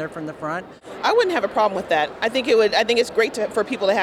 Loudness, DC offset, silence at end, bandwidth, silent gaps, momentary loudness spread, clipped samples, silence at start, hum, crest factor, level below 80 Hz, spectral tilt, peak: -20 LUFS; under 0.1%; 0 s; 14 kHz; none; 12 LU; under 0.1%; 0 s; none; 14 dB; -58 dBFS; -3.5 dB/octave; -6 dBFS